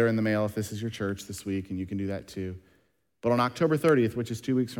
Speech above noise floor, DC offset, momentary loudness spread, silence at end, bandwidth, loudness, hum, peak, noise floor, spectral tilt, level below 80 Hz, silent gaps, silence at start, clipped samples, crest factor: 42 dB; under 0.1%; 12 LU; 0 s; 18 kHz; -29 LUFS; none; -10 dBFS; -70 dBFS; -6.5 dB/octave; -62 dBFS; none; 0 s; under 0.1%; 18 dB